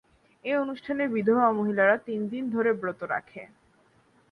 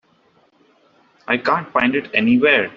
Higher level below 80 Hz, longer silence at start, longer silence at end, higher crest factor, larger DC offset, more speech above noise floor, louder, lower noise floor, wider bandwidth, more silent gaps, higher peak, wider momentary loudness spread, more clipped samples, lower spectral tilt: second, -70 dBFS vs -60 dBFS; second, 0.45 s vs 1.3 s; first, 0.85 s vs 0.05 s; about the same, 18 dB vs 18 dB; neither; second, 37 dB vs 41 dB; second, -26 LUFS vs -17 LUFS; first, -63 dBFS vs -58 dBFS; second, 5.2 kHz vs 5.8 kHz; neither; second, -10 dBFS vs -2 dBFS; first, 10 LU vs 6 LU; neither; first, -8.5 dB/octave vs -2.5 dB/octave